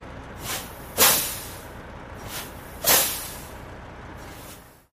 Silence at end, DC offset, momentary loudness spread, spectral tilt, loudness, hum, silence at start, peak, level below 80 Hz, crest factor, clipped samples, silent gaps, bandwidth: 0.2 s; under 0.1%; 23 LU; -1 dB/octave; -22 LUFS; 60 Hz at -50 dBFS; 0 s; -4 dBFS; -46 dBFS; 24 dB; under 0.1%; none; 15.5 kHz